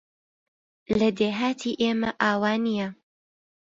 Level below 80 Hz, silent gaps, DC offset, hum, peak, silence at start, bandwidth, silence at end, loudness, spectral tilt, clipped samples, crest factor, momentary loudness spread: -58 dBFS; none; under 0.1%; none; -6 dBFS; 0.9 s; 7.8 kHz; 0.75 s; -25 LUFS; -5.5 dB/octave; under 0.1%; 20 dB; 6 LU